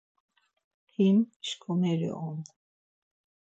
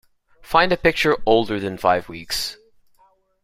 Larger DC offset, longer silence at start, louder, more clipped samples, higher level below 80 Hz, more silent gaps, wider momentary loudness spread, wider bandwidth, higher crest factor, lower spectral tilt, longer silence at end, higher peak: neither; first, 1 s vs 0.5 s; second, -29 LUFS vs -20 LUFS; neither; second, -80 dBFS vs -46 dBFS; first, 1.36-1.40 s vs none; first, 17 LU vs 8 LU; second, 8 kHz vs 16 kHz; about the same, 16 dB vs 20 dB; first, -7 dB/octave vs -4 dB/octave; about the same, 1 s vs 0.9 s; second, -16 dBFS vs 0 dBFS